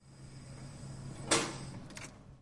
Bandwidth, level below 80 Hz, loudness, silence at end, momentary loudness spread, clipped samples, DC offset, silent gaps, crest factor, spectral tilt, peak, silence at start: 11.5 kHz; -60 dBFS; -37 LUFS; 0 s; 19 LU; under 0.1%; under 0.1%; none; 26 dB; -3 dB/octave; -14 dBFS; 0 s